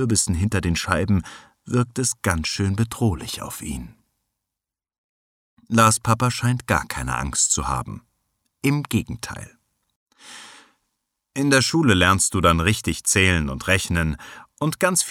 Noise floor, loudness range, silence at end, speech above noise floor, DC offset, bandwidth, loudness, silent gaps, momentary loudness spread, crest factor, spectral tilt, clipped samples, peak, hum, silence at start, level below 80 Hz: -87 dBFS; 9 LU; 0 s; 66 dB; under 0.1%; 17 kHz; -21 LUFS; 4.98-5.57 s, 9.96-10.06 s; 17 LU; 20 dB; -4 dB/octave; under 0.1%; -2 dBFS; none; 0 s; -40 dBFS